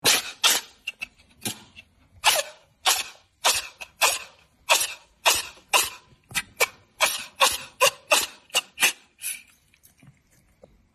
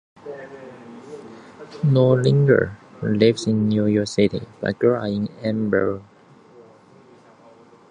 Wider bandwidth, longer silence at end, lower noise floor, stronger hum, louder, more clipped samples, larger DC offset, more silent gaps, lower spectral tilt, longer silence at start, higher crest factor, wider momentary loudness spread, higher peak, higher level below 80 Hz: first, 13.5 kHz vs 9.8 kHz; second, 1.55 s vs 1.9 s; first, -61 dBFS vs -50 dBFS; neither; second, -23 LUFS vs -20 LUFS; neither; neither; neither; second, 1 dB/octave vs -7.5 dB/octave; second, 0.05 s vs 0.25 s; about the same, 24 dB vs 20 dB; second, 14 LU vs 23 LU; about the same, -4 dBFS vs -2 dBFS; second, -62 dBFS vs -54 dBFS